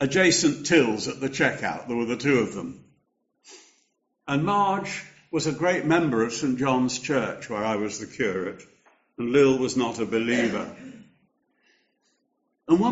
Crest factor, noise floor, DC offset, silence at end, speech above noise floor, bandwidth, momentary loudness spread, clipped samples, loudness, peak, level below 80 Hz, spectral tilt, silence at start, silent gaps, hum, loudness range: 18 dB; -74 dBFS; under 0.1%; 0 s; 50 dB; 8 kHz; 14 LU; under 0.1%; -24 LUFS; -6 dBFS; -62 dBFS; -4 dB/octave; 0 s; none; none; 4 LU